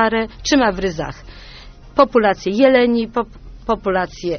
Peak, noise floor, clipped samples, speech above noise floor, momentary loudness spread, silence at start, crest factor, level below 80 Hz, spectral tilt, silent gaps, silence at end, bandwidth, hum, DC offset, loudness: 0 dBFS; -38 dBFS; under 0.1%; 22 dB; 15 LU; 0 s; 18 dB; -38 dBFS; -3.5 dB/octave; none; 0 s; 6.6 kHz; none; under 0.1%; -17 LUFS